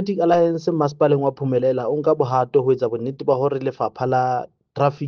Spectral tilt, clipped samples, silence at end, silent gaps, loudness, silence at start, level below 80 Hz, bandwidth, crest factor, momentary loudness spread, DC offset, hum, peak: -8.5 dB/octave; under 0.1%; 0 s; none; -20 LUFS; 0 s; -62 dBFS; 6.8 kHz; 16 dB; 6 LU; under 0.1%; none; -4 dBFS